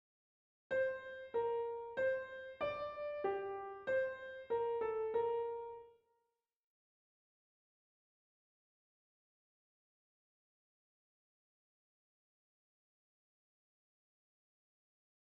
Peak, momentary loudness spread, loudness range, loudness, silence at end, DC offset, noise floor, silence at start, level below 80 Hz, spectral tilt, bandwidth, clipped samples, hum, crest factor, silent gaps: -26 dBFS; 9 LU; 5 LU; -41 LUFS; 9.3 s; under 0.1%; -86 dBFS; 0.7 s; -78 dBFS; -2.5 dB/octave; 7.2 kHz; under 0.1%; none; 18 dB; none